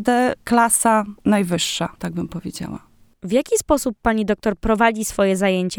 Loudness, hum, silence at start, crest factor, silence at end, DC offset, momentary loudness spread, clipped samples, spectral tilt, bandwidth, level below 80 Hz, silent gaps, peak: -19 LUFS; none; 0 s; 16 dB; 0 s; under 0.1%; 14 LU; under 0.1%; -4 dB/octave; 19.5 kHz; -42 dBFS; none; -2 dBFS